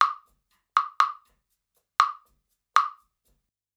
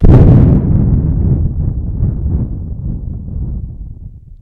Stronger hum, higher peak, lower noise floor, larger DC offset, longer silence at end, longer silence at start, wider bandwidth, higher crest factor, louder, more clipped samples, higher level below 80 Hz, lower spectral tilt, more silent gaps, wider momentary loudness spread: neither; about the same, -2 dBFS vs 0 dBFS; first, -76 dBFS vs -31 dBFS; neither; first, 0.85 s vs 0.1 s; about the same, 0 s vs 0 s; first, 14 kHz vs 3.4 kHz; first, 28 dB vs 12 dB; second, -26 LUFS vs -13 LUFS; second, under 0.1% vs 2%; second, -78 dBFS vs -16 dBFS; second, 2.5 dB/octave vs -12 dB/octave; neither; about the same, 17 LU vs 19 LU